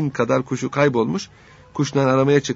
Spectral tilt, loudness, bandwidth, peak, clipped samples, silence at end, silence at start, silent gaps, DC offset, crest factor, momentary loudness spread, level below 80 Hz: -6 dB/octave; -20 LUFS; 8 kHz; -2 dBFS; under 0.1%; 0 s; 0 s; none; under 0.1%; 18 dB; 11 LU; -56 dBFS